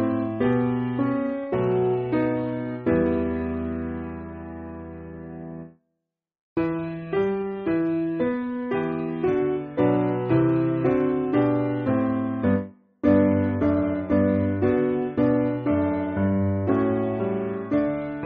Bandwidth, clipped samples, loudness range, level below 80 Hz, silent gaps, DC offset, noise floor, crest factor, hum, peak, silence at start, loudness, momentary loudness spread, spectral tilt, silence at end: 4.7 kHz; under 0.1%; 8 LU; -50 dBFS; 6.41-6.56 s; under 0.1%; -81 dBFS; 18 dB; none; -6 dBFS; 0 s; -24 LUFS; 11 LU; -8.5 dB/octave; 0 s